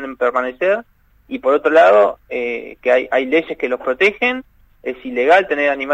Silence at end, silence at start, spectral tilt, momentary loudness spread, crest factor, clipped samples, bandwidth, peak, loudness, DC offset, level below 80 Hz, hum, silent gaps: 0 s; 0 s; -4.5 dB/octave; 13 LU; 16 dB; under 0.1%; 8.8 kHz; 0 dBFS; -16 LUFS; under 0.1%; -54 dBFS; none; none